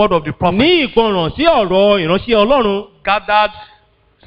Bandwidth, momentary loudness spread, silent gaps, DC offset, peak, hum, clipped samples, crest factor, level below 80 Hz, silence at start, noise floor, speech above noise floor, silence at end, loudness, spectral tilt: 5.6 kHz; 6 LU; none; under 0.1%; 0 dBFS; none; under 0.1%; 14 dB; -38 dBFS; 0 s; -52 dBFS; 39 dB; 0.65 s; -13 LUFS; -8 dB/octave